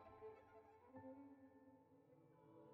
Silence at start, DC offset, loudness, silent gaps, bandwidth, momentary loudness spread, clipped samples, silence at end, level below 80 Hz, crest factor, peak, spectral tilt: 0 s; under 0.1%; -64 LUFS; none; 4 kHz; 8 LU; under 0.1%; 0 s; -88 dBFS; 16 dB; -48 dBFS; -7 dB/octave